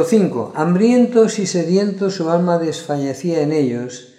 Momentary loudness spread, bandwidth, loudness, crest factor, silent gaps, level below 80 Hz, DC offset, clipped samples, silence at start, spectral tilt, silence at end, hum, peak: 8 LU; 13 kHz; -17 LUFS; 16 dB; none; -70 dBFS; under 0.1%; under 0.1%; 0 s; -6.5 dB/octave; 0.15 s; none; -2 dBFS